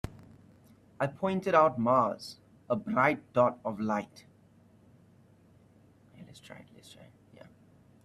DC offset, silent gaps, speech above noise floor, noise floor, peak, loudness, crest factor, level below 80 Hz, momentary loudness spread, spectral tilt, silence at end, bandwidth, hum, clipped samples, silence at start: under 0.1%; none; 32 dB; -61 dBFS; -10 dBFS; -29 LUFS; 24 dB; -62 dBFS; 25 LU; -7 dB/octave; 1.45 s; 13 kHz; none; under 0.1%; 0.05 s